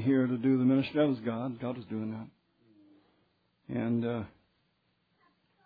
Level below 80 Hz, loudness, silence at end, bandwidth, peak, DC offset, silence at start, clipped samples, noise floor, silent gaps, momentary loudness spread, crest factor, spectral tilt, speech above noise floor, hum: -72 dBFS; -31 LUFS; 1.35 s; 5 kHz; -16 dBFS; under 0.1%; 0 s; under 0.1%; -75 dBFS; none; 13 LU; 16 dB; -10.5 dB/octave; 45 dB; none